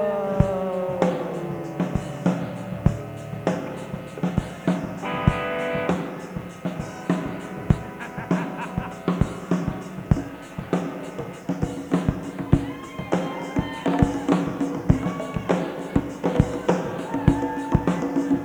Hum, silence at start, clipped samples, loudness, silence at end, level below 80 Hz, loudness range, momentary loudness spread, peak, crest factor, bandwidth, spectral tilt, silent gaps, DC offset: none; 0 s; under 0.1%; -26 LUFS; 0 s; -38 dBFS; 3 LU; 10 LU; -2 dBFS; 24 dB; 20 kHz; -7.5 dB/octave; none; under 0.1%